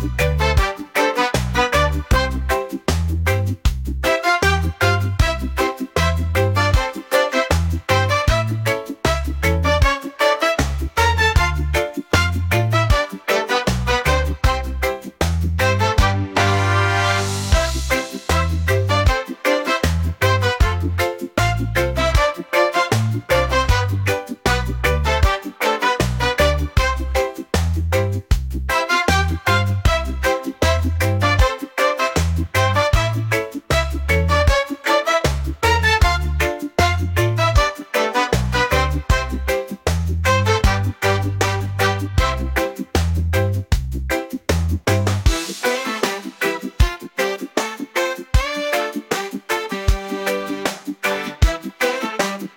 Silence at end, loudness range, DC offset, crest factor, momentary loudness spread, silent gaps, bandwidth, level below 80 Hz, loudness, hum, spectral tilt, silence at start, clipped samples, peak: 0.05 s; 3 LU; under 0.1%; 16 dB; 6 LU; none; 17 kHz; -26 dBFS; -19 LUFS; none; -5 dB/octave; 0 s; under 0.1%; -2 dBFS